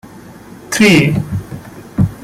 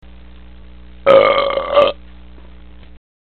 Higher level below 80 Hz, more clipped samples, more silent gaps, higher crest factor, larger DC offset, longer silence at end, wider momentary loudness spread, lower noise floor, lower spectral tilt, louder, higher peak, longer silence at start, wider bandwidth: about the same, -38 dBFS vs -40 dBFS; neither; neither; about the same, 14 dB vs 18 dB; second, under 0.1% vs 1%; second, 0 s vs 1.4 s; first, 20 LU vs 9 LU; second, -35 dBFS vs -40 dBFS; about the same, -5 dB/octave vs -6 dB/octave; about the same, -13 LUFS vs -13 LUFS; about the same, 0 dBFS vs 0 dBFS; second, 0.05 s vs 1.05 s; first, 16 kHz vs 4.6 kHz